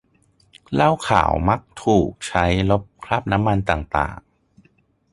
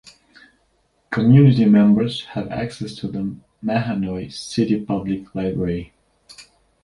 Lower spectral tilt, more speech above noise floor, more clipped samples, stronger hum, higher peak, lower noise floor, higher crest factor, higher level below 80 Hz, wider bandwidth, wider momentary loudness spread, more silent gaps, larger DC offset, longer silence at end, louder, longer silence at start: second, -6 dB/octave vs -7.5 dB/octave; second, 41 dB vs 46 dB; neither; neither; about the same, -2 dBFS vs -2 dBFS; second, -60 dBFS vs -64 dBFS; about the same, 20 dB vs 18 dB; first, -36 dBFS vs -48 dBFS; about the same, 11.5 kHz vs 11 kHz; second, 6 LU vs 16 LU; neither; neither; first, 0.95 s vs 0.4 s; about the same, -20 LUFS vs -19 LUFS; second, 0.7 s vs 1.1 s